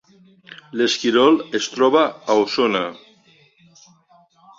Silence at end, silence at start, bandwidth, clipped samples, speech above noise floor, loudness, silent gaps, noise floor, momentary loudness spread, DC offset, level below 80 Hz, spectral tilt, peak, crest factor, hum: 1.65 s; 0.5 s; 7.8 kHz; under 0.1%; 36 dB; -18 LUFS; none; -55 dBFS; 9 LU; under 0.1%; -66 dBFS; -3.5 dB/octave; -4 dBFS; 18 dB; none